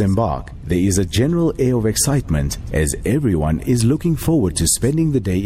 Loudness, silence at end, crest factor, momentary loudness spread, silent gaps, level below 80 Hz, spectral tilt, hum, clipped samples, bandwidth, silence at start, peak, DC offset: -18 LUFS; 0 s; 12 dB; 5 LU; none; -30 dBFS; -5.5 dB/octave; none; under 0.1%; 15.5 kHz; 0 s; -6 dBFS; under 0.1%